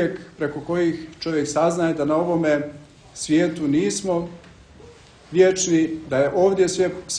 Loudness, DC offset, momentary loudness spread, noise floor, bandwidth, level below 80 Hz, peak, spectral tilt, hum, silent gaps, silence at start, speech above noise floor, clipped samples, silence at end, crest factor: -21 LUFS; under 0.1%; 10 LU; -46 dBFS; 10.5 kHz; -54 dBFS; -4 dBFS; -5 dB/octave; none; none; 0 s; 26 dB; under 0.1%; 0 s; 18 dB